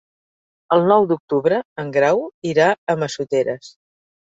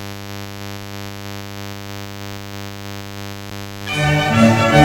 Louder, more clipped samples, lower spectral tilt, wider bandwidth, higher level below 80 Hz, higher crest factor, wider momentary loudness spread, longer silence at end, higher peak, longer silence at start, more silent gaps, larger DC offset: about the same, -19 LUFS vs -21 LUFS; neither; about the same, -6 dB/octave vs -5.5 dB/octave; second, 7.8 kHz vs 19 kHz; second, -64 dBFS vs -42 dBFS; about the same, 18 dB vs 20 dB; second, 8 LU vs 17 LU; first, 0.65 s vs 0 s; about the same, -2 dBFS vs 0 dBFS; first, 0.7 s vs 0 s; first, 1.20-1.28 s, 1.65-1.76 s, 2.34-2.42 s, 2.78-2.87 s vs none; neither